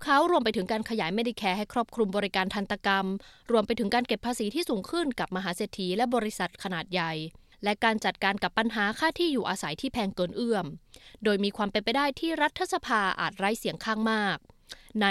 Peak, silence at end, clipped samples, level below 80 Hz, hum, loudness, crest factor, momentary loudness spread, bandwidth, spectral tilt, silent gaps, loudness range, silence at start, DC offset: -10 dBFS; 0 s; under 0.1%; -58 dBFS; none; -28 LUFS; 18 dB; 6 LU; 15 kHz; -4.5 dB/octave; none; 2 LU; 0 s; under 0.1%